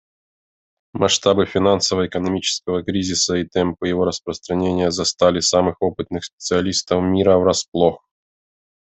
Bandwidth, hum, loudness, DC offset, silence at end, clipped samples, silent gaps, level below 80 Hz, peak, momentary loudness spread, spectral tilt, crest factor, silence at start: 8.4 kHz; none; -19 LUFS; under 0.1%; 0.9 s; under 0.1%; 6.33-6.38 s, 7.68-7.72 s; -54 dBFS; -2 dBFS; 7 LU; -4 dB/octave; 18 dB; 0.95 s